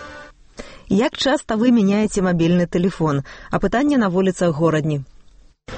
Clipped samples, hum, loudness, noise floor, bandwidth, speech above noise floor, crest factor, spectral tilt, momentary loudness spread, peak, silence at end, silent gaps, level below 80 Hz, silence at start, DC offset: under 0.1%; none; -19 LUFS; -47 dBFS; 8.8 kHz; 30 dB; 14 dB; -6.5 dB/octave; 9 LU; -4 dBFS; 0 s; none; -42 dBFS; 0 s; under 0.1%